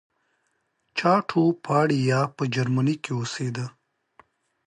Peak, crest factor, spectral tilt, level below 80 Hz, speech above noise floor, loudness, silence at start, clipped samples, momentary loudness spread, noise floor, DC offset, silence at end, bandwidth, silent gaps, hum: -6 dBFS; 18 dB; -6.5 dB/octave; -68 dBFS; 50 dB; -24 LUFS; 0.95 s; under 0.1%; 9 LU; -73 dBFS; under 0.1%; 0.95 s; 11 kHz; none; none